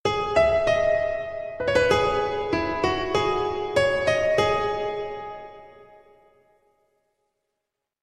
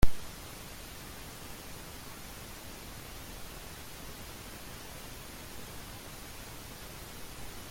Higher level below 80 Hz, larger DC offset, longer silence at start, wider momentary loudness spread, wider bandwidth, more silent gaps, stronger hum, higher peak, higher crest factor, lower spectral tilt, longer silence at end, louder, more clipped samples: about the same, -46 dBFS vs -44 dBFS; neither; about the same, 0.05 s vs 0 s; first, 12 LU vs 0 LU; second, 12 kHz vs 17 kHz; neither; neither; first, -6 dBFS vs -10 dBFS; second, 18 dB vs 24 dB; about the same, -4.5 dB/octave vs -3.5 dB/octave; first, 2.2 s vs 0 s; first, -23 LUFS vs -45 LUFS; neither